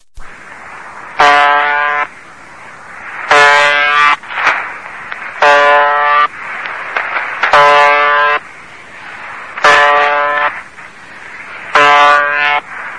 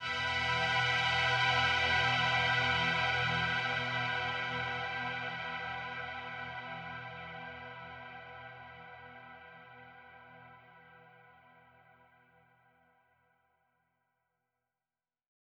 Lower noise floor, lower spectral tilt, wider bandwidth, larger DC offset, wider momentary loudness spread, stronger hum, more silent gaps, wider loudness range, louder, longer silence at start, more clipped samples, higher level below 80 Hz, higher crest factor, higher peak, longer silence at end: second, -34 dBFS vs under -90 dBFS; second, -1.5 dB/octave vs -3.5 dB/octave; about the same, 11 kHz vs 10.5 kHz; first, 0.8% vs under 0.1%; about the same, 22 LU vs 22 LU; neither; neither; second, 3 LU vs 23 LU; first, -9 LUFS vs -32 LUFS; first, 0.15 s vs 0 s; first, 0.6% vs under 0.1%; first, -48 dBFS vs -60 dBFS; second, 12 dB vs 18 dB; first, 0 dBFS vs -18 dBFS; second, 0 s vs 4.45 s